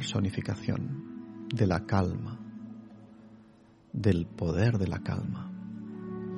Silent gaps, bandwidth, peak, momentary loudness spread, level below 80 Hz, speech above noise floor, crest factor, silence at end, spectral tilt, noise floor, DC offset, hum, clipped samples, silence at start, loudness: none; 11 kHz; -12 dBFS; 17 LU; -54 dBFS; 28 dB; 20 dB; 0 s; -7 dB/octave; -58 dBFS; under 0.1%; none; under 0.1%; 0 s; -32 LUFS